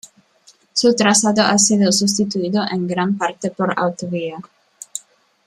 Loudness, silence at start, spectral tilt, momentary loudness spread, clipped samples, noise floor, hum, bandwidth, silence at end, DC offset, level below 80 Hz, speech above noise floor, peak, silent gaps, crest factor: -17 LUFS; 0.75 s; -3.5 dB/octave; 17 LU; under 0.1%; -53 dBFS; none; 13.5 kHz; 0.5 s; under 0.1%; -62 dBFS; 36 dB; -2 dBFS; none; 18 dB